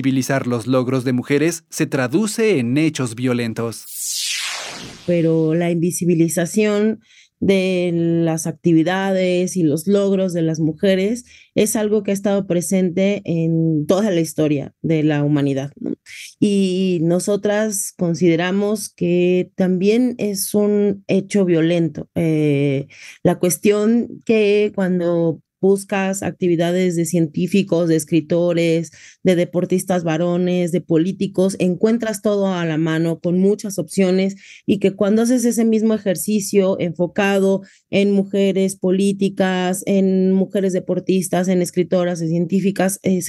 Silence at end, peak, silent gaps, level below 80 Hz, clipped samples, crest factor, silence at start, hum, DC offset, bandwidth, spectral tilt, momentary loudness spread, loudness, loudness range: 0 s; -4 dBFS; none; -64 dBFS; under 0.1%; 14 dB; 0 s; none; under 0.1%; 16 kHz; -6 dB/octave; 5 LU; -18 LUFS; 1 LU